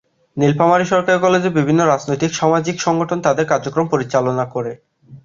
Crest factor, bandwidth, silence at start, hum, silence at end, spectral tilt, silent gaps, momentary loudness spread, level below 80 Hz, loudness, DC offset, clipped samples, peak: 16 dB; 7.6 kHz; 0.35 s; none; 0.05 s; -5.5 dB/octave; none; 6 LU; -56 dBFS; -16 LUFS; under 0.1%; under 0.1%; -2 dBFS